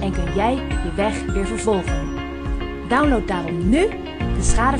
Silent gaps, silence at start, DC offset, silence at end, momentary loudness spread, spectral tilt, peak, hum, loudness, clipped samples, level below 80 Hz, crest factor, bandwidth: none; 0 s; under 0.1%; 0 s; 9 LU; -5.5 dB/octave; -4 dBFS; none; -21 LUFS; under 0.1%; -26 dBFS; 16 dB; 10.5 kHz